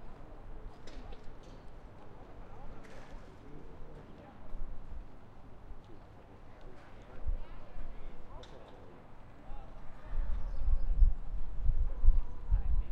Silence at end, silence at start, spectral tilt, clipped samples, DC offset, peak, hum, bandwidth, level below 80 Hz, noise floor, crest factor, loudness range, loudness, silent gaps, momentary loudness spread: 0 s; 0 s; -8 dB/octave; under 0.1%; under 0.1%; -12 dBFS; none; 3.9 kHz; -36 dBFS; -52 dBFS; 22 dB; 15 LU; -41 LUFS; none; 21 LU